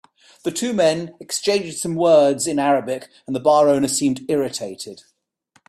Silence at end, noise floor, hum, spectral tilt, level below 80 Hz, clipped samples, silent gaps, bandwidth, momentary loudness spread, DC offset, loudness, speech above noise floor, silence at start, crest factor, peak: 0.75 s; -62 dBFS; none; -4 dB/octave; -64 dBFS; under 0.1%; none; 14 kHz; 14 LU; under 0.1%; -19 LUFS; 43 dB; 0.45 s; 16 dB; -4 dBFS